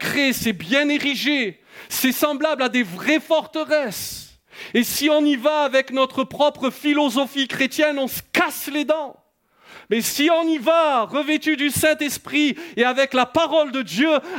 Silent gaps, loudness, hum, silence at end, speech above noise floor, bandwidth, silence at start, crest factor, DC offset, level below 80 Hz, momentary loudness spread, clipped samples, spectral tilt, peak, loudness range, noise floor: none; -20 LUFS; none; 0 s; 33 dB; 18 kHz; 0 s; 16 dB; under 0.1%; -60 dBFS; 6 LU; under 0.1%; -3 dB/octave; -4 dBFS; 2 LU; -53 dBFS